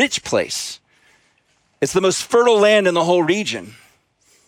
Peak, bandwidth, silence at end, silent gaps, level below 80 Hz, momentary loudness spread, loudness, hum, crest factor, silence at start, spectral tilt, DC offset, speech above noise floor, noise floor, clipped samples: -2 dBFS; 16.5 kHz; 0.75 s; none; -58 dBFS; 13 LU; -17 LUFS; none; 16 dB; 0 s; -3.5 dB/octave; under 0.1%; 45 dB; -62 dBFS; under 0.1%